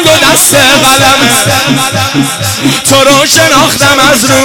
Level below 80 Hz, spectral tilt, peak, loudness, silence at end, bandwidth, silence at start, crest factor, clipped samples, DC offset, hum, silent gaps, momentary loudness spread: -34 dBFS; -2.5 dB/octave; 0 dBFS; -4 LUFS; 0 s; over 20 kHz; 0 s; 6 dB; 2%; under 0.1%; none; none; 6 LU